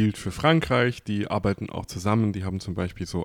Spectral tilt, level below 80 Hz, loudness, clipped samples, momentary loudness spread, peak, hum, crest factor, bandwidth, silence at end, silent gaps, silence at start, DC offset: -6.5 dB/octave; -46 dBFS; -25 LUFS; under 0.1%; 10 LU; -6 dBFS; none; 20 dB; 15.5 kHz; 0 s; none; 0 s; under 0.1%